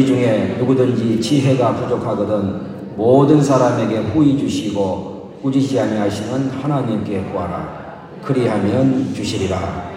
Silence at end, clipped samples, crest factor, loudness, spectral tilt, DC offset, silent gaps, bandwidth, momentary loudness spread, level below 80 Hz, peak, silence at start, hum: 0 s; under 0.1%; 16 dB; -17 LUFS; -7 dB/octave; under 0.1%; none; 11.5 kHz; 11 LU; -52 dBFS; 0 dBFS; 0 s; none